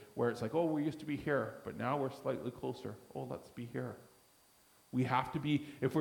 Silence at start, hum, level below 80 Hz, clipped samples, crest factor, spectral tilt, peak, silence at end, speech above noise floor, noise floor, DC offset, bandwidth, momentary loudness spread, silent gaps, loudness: 0 s; none; -70 dBFS; under 0.1%; 20 dB; -7 dB/octave; -18 dBFS; 0 s; 30 dB; -67 dBFS; under 0.1%; 19 kHz; 12 LU; none; -38 LUFS